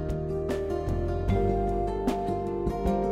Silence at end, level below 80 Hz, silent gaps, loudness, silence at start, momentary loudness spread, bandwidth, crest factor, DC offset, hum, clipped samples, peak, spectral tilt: 0 s; -34 dBFS; none; -29 LUFS; 0 s; 4 LU; 14.5 kHz; 14 dB; under 0.1%; none; under 0.1%; -14 dBFS; -8.5 dB/octave